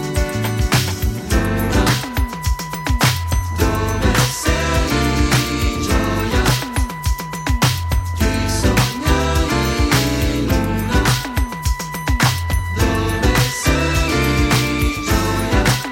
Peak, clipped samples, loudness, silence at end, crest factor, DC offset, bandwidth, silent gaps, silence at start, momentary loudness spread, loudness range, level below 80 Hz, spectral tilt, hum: -2 dBFS; under 0.1%; -18 LUFS; 0 s; 16 dB; under 0.1%; 17 kHz; none; 0 s; 6 LU; 2 LU; -22 dBFS; -4.5 dB/octave; none